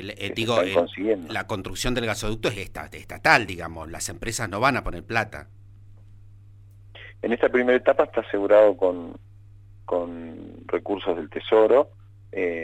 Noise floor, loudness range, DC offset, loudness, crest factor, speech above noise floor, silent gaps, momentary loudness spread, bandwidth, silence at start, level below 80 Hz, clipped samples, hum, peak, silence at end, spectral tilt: -48 dBFS; 6 LU; under 0.1%; -23 LUFS; 22 dB; 24 dB; none; 17 LU; 16 kHz; 0 s; -44 dBFS; under 0.1%; none; -2 dBFS; 0 s; -4.5 dB/octave